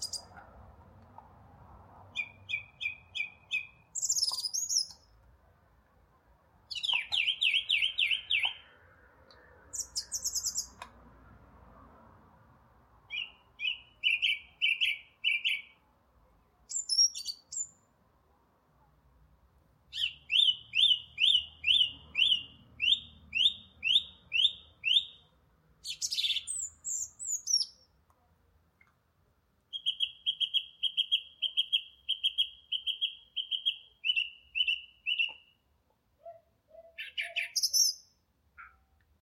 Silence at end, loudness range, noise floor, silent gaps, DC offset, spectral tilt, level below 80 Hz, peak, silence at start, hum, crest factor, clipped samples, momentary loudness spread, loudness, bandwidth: 0.55 s; 11 LU; -73 dBFS; none; under 0.1%; 3 dB/octave; -68 dBFS; -14 dBFS; 0 s; none; 20 dB; under 0.1%; 13 LU; -30 LUFS; 16.5 kHz